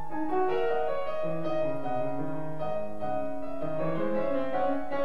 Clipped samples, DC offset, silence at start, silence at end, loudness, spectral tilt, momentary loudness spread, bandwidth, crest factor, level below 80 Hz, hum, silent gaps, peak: under 0.1%; 3%; 0 s; 0 s; -31 LUFS; -8 dB/octave; 6 LU; 12.5 kHz; 14 dB; -58 dBFS; none; none; -16 dBFS